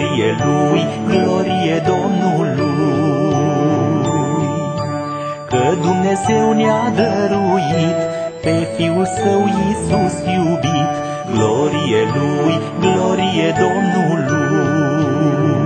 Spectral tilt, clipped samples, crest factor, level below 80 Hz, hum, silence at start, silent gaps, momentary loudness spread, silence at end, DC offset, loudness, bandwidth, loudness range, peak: -6.5 dB/octave; under 0.1%; 14 dB; -46 dBFS; none; 0 s; none; 4 LU; 0 s; under 0.1%; -16 LUFS; 9.2 kHz; 1 LU; 0 dBFS